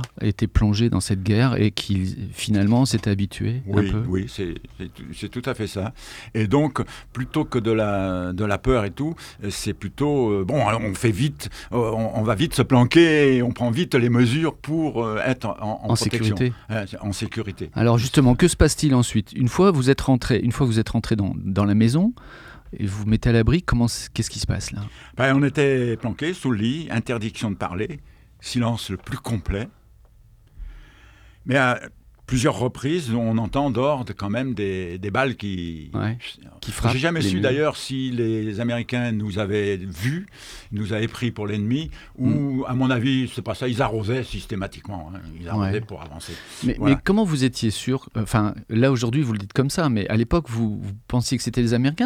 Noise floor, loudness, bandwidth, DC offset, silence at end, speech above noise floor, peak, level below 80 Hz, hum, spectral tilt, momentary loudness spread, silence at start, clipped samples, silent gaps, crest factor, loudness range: -52 dBFS; -22 LUFS; 15.5 kHz; under 0.1%; 0 s; 30 dB; 0 dBFS; -40 dBFS; none; -6 dB/octave; 12 LU; 0 s; under 0.1%; none; 22 dB; 7 LU